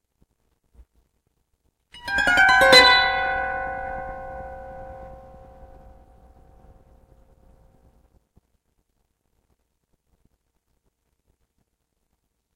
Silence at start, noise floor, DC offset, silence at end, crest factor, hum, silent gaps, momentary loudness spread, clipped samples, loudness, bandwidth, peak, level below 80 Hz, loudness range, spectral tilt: 1.95 s; -75 dBFS; under 0.1%; 7.4 s; 24 dB; none; none; 28 LU; under 0.1%; -16 LUFS; 16.5 kHz; -2 dBFS; -48 dBFS; 20 LU; -1.5 dB/octave